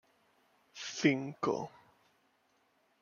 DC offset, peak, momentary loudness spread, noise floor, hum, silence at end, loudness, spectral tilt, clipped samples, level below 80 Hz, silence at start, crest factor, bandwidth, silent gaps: under 0.1%; -12 dBFS; 16 LU; -74 dBFS; none; 1.35 s; -34 LUFS; -5 dB/octave; under 0.1%; -82 dBFS; 0.75 s; 26 dB; 7.2 kHz; none